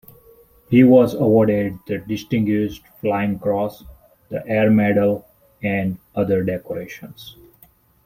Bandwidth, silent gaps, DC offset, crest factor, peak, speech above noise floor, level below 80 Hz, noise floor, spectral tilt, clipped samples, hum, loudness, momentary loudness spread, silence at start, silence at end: 16 kHz; none; under 0.1%; 18 dB; -2 dBFS; 35 dB; -52 dBFS; -54 dBFS; -8.5 dB/octave; under 0.1%; none; -19 LUFS; 16 LU; 0.7 s; 0.75 s